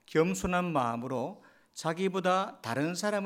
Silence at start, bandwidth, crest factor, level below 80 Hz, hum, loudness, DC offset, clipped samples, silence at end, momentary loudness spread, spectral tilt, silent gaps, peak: 0.1 s; 16 kHz; 18 dB; -56 dBFS; none; -31 LUFS; under 0.1%; under 0.1%; 0 s; 8 LU; -5 dB/octave; none; -14 dBFS